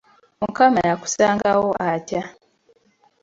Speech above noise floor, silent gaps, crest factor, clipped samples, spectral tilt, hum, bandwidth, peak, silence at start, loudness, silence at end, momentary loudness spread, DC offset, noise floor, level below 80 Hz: 41 dB; none; 20 dB; under 0.1%; -4.5 dB/octave; none; 8 kHz; -2 dBFS; 0.4 s; -20 LUFS; 0.9 s; 12 LU; under 0.1%; -60 dBFS; -56 dBFS